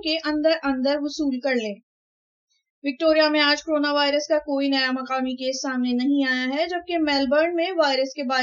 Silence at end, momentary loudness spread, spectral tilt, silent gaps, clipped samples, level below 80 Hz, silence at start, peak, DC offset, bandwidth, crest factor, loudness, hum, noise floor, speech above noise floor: 0 s; 7 LU; -2.5 dB/octave; 1.83-2.48 s, 2.70-2.82 s; under 0.1%; -60 dBFS; 0.05 s; -6 dBFS; under 0.1%; 7.6 kHz; 16 dB; -22 LUFS; none; under -90 dBFS; over 68 dB